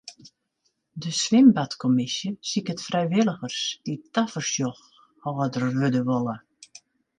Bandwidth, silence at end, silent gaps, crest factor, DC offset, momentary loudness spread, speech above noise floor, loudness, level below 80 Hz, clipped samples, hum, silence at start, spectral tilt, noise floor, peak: 9.6 kHz; 0.8 s; none; 20 dB; under 0.1%; 15 LU; 50 dB; -24 LUFS; -68 dBFS; under 0.1%; none; 0.05 s; -5 dB/octave; -74 dBFS; -6 dBFS